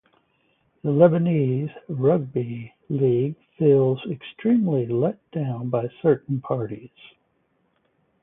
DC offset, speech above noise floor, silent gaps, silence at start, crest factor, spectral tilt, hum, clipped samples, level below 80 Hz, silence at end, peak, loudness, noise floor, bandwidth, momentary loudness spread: under 0.1%; 46 dB; none; 0.85 s; 20 dB; -13 dB/octave; none; under 0.1%; -64 dBFS; 1.35 s; -2 dBFS; -23 LUFS; -68 dBFS; 3.8 kHz; 13 LU